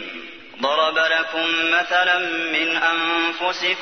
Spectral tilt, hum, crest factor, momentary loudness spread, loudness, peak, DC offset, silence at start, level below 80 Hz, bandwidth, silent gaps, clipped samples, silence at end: -1.5 dB/octave; none; 16 dB; 7 LU; -19 LUFS; -6 dBFS; 0.2%; 0 s; -66 dBFS; 6.6 kHz; none; under 0.1%; 0 s